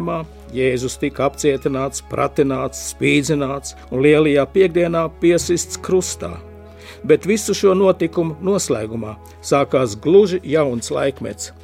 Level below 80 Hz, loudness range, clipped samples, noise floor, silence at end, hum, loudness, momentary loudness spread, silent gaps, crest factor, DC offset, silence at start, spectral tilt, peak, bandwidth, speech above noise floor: -42 dBFS; 2 LU; under 0.1%; -38 dBFS; 0.1 s; none; -18 LUFS; 14 LU; none; 18 dB; under 0.1%; 0 s; -5 dB/octave; 0 dBFS; 16 kHz; 21 dB